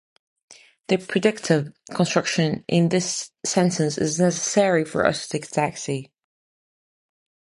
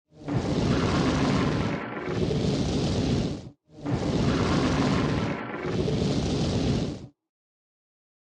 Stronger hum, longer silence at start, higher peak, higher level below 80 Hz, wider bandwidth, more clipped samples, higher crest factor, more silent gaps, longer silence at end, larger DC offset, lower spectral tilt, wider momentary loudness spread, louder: neither; first, 0.5 s vs 0.15 s; first, -4 dBFS vs -12 dBFS; second, -60 dBFS vs -40 dBFS; about the same, 11.5 kHz vs 10.5 kHz; neither; about the same, 18 dB vs 16 dB; neither; first, 1.5 s vs 1.25 s; neither; second, -4.5 dB/octave vs -6.5 dB/octave; about the same, 8 LU vs 8 LU; first, -22 LUFS vs -27 LUFS